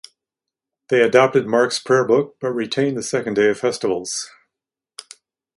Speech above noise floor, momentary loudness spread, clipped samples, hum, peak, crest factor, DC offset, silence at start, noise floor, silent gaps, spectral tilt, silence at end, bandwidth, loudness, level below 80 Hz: 67 dB; 13 LU; under 0.1%; none; 0 dBFS; 20 dB; under 0.1%; 0.9 s; -86 dBFS; none; -4 dB/octave; 1.3 s; 11.5 kHz; -19 LUFS; -64 dBFS